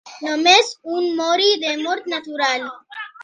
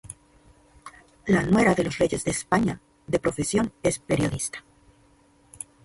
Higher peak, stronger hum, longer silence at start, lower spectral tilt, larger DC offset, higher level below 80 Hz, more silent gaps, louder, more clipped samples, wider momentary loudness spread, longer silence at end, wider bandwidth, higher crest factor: first, 0 dBFS vs -6 dBFS; neither; about the same, 0.05 s vs 0.05 s; second, 0 dB/octave vs -5 dB/octave; neither; second, -76 dBFS vs -48 dBFS; neither; first, -18 LUFS vs -24 LUFS; neither; second, 14 LU vs 21 LU; second, 0 s vs 1.25 s; second, 10 kHz vs 12 kHz; about the same, 20 dB vs 20 dB